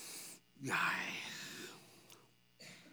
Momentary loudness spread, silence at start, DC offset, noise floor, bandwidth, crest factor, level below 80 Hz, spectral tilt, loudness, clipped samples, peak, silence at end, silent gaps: 24 LU; 0 s; under 0.1%; -65 dBFS; over 20 kHz; 22 dB; -88 dBFS; -2 dB/octave; -41 LUFS; under 0.1%; -22 dBFS; 0 s; none